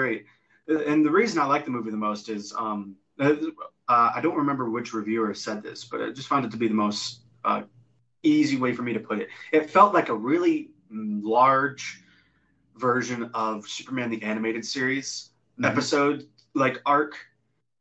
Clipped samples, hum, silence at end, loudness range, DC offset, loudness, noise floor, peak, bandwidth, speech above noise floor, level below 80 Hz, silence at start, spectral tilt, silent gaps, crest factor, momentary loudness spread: under 0.1%; none; 0.6 s; 5 LU; under 0.1%; -25 LUFS; -73 dBFS; -4 dBFS; 8.4 kHz; 48 dB; -72 dBFS; 0 s; -5 dB/octave; none; 22 dB; 13 LU